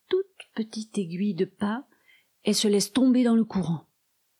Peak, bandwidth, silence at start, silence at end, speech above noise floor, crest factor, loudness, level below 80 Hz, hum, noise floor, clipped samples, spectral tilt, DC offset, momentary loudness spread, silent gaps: -12 dBFS; 14.5 kHz; 0.1 s; 0.6 s; 48 dB; 14 dB; -26 LUFS; -64 dBFS; none; -72 dBFS; under 0.1%; -5 dB/octave; under 0.1%; 13 LU; none